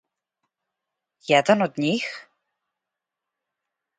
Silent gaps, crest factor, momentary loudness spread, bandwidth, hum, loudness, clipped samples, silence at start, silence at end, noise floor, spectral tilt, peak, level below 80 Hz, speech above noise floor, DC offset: none; 24 dB; 20 LU; 9.4 kHz; none; -22 LUFS; under 0.1%; 1.3 s; 1.8 s; -86 dBFS; -5 dB/octave; -4 dBFS; -72 dBFS; 64 dB; under 0.1%